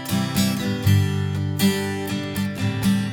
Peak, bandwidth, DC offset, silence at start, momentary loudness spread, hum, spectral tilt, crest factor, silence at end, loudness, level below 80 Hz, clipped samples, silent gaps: -6 dBFS; 19 kHz; under 0.1%; 0 s; 6 LU; 50 Hz at -35 dBFS; -5.5 dB/octave; 14 dB; 0 s; -22 LUFS; -50 dBFS; under 0.1%; none